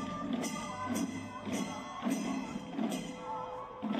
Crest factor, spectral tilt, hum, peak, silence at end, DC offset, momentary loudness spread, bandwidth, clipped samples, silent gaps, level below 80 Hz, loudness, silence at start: 16 dB; -4.5 dB/octave; none; -22 dBFS; 0 s; under 0.1%; 5 LU; 16 kHz; under 0.1%; none; -66 dBFS; -38 LUFS; 0 s